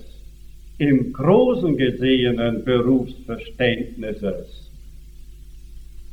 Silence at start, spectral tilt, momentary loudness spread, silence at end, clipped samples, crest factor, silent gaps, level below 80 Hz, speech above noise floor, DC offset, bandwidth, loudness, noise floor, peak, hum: 0 s; -8 dB/octave; 14 LU; 0.1 s; under 0.1%; 18 dB; none; -40 dBFS; 20 dB; under 0.1%; 8.4 kHz; -20 LUFS; -40 dBFS; -2 dBFS; none